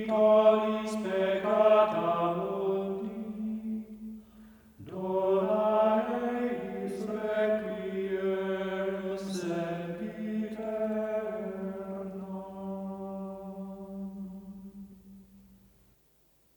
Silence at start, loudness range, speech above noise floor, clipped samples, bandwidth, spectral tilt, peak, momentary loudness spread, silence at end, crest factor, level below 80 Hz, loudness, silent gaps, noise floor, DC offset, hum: 0 s; 13 LU; 41 dB; under 0.1%; over 20 kHz; -7 dB/octave; -12 dBFS; 18 LU; 1.2 s; 18 dB; -66 dBFS; -30 LUFS; none; -66 dBFS; under 0.1%; none